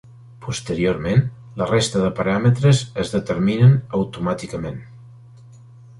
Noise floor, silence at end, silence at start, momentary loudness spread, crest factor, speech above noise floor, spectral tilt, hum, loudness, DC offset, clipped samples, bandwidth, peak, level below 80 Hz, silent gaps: -44 dBFS; 0.9 s; 0.4 s; 14 LU; 16 dB; 25 dB; -6.5 dB/octave; none; -20 LUFS; under 0.1%; under 0.1%; 11.5 kHz; -4 dBFS; -46 dBFS; none